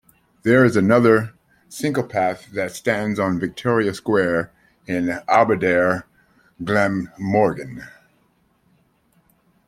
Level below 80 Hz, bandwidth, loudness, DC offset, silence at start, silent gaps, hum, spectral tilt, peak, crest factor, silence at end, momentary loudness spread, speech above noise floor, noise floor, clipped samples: -56 dBFS; 16 kHz; -19 LUFS; under 0.1%; 0.45 s; none; none; -6.5 dB/octave; 0 dBFS; 20 dB; 1.8 s; 12 LU; 43 dB; -62 dBFS; under 0.1%